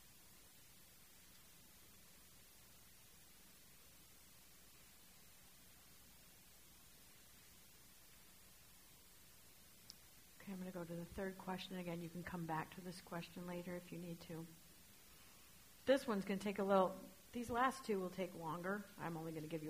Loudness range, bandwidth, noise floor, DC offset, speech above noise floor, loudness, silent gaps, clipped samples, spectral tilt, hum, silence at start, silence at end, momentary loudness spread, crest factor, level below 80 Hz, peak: 22 LU; 15.5 kHz; -66 dBFS; under 0.1%; 22 dB; -45 LUFS; none; under 0.1%; -5.5 dB/octave; none; 0 s; 0 s; 23 LU; 26 dB; -74 dBFS; -22 dBFS